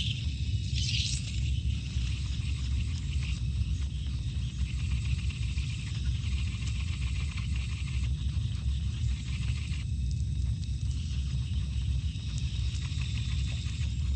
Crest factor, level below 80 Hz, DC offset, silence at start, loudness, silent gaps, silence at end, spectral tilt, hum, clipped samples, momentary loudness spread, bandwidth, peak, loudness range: 14 dB; -34 dBFS; under 0.1%; 0 s; -33 LUFS; none; 0 s; -4.5 dB/octave; none; under 0.1%; 2 LU; 9.2 kHz; -16 dBFS; 1 LU